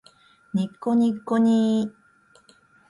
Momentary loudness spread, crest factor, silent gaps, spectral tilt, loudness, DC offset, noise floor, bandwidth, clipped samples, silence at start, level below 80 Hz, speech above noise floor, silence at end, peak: 9 LU; 14 dB; none; -7.5 dB/octave; -23 LUFS; under 0.1%; -58 dBFS; 11 kHz; under 0.1%; 0.55 s; -68 dBFS; 37 dB; 1 s; -10 dBFS